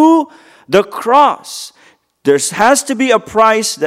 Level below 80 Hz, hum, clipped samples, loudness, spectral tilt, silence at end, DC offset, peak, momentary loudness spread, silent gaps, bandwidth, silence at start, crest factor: -56 dBFS; none; under 0.1%; -12 LUFS; -3 dB/octave; 0 s; under 0.1%; 0 dBFS; 16 LU; none; 16 kHz; 0 s; 12 dB